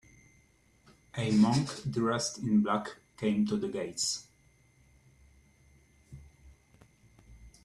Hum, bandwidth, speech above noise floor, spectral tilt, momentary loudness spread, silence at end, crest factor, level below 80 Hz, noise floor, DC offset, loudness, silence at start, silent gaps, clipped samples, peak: none; 12 kHz; 36 dB; -5 dB/octave; 12 LU; 0.15 s; 20 dB; -62 dBFS; -65 dBFS; under 0.1%; -30 LUFS; 1.15 s; none; under 0.1%; -14 dBFS